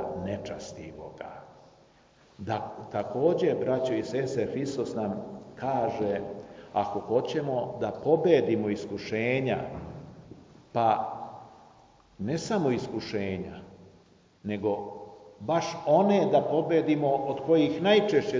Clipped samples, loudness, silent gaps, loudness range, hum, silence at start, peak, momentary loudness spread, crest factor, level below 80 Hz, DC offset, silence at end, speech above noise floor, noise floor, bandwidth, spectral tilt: under 0.1%; -28 LUFS; none; 7 LU; none; 0 s; -8 dBFS; 19 LU; 20 dB; -60 dBFS; under 0.1%; 0 s; 32 dB; -59 dBFS; 7.6 kHz; -6.5 dB/octave